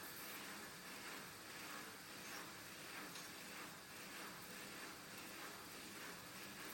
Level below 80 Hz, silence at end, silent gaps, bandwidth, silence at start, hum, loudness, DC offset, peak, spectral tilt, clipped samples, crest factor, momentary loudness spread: -82 dBFS; 0 s; none; 17 kHz; 0 s; none; -52 LUFS; under 0.1%; -38 dBFS; -2 dB/octave; under 0.1%; 16 dB; 2 LU